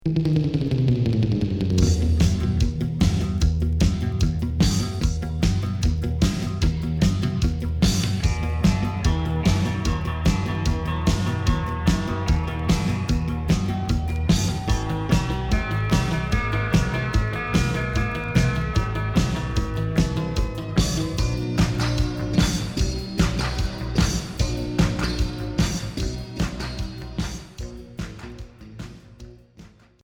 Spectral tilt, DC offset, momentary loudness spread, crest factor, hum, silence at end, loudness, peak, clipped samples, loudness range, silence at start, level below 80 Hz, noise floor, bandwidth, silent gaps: -6 dB/octave; under 0.1%; 6 LU; 16 dB; none; 0.35 s; -23 LUFS; -6 dBFS; under 0.1%; 4 LU; 0.05 s; -28 dBFS; -48 dBFS; 18 kHz; none